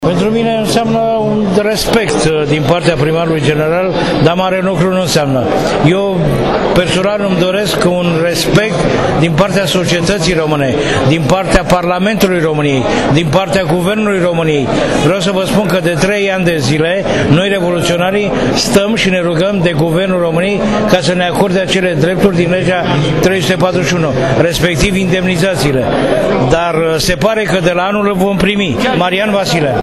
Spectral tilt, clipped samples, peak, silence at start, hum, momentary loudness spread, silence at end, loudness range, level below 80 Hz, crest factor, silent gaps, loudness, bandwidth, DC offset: -5.5 dB/octave; 0.1%; 0 dBFS; 0 s; none; 2 LU; 0 s; 0 LU; -30 dBFS; 12 dB; none; -11 LUFS; 14.5 kHz; under 0.1%